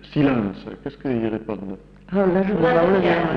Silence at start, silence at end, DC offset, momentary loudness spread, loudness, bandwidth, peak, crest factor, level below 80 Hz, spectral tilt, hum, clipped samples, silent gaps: 0.05 s; 0 s; under 0.1%; 16 LU; -21 LUFS; 6 kHz; -6 dBFS; 14 dB; -46 dBFS; -9 dB/octave; none; under 0.1%; none